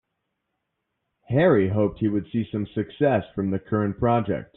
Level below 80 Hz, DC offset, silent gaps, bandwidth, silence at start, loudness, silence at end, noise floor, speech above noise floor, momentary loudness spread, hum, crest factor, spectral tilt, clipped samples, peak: -52 dBFS; under 0.1%; none; 4.1 kHz; 1.3 s; -24 LUFS; 0.1 s; -79 dBFS; 56 dB; 9 LU; none; 18 dB; -7.5 dB/octave; under 0.1%; -6 dBFS